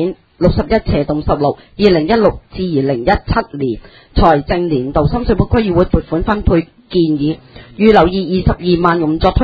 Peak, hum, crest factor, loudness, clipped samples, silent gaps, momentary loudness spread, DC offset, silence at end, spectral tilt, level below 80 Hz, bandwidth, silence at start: 0 dBFS; none; 14 dB; -14 LUFS; 0.1%; none; 8 LU; under 0.1%; 0 s; -9 dB/octave; -24 dBFS; 7.4 kHz; 0 s